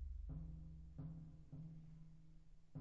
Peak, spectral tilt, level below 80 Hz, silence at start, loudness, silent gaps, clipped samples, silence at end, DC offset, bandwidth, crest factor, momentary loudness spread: -42 dBFS; -11 dB/octave; -56 dBFS; 0 s; -56 LUFS; none; under 0.1%; 0 s; under 0.1%; 7.2 kHz; 14 dB; 12 LU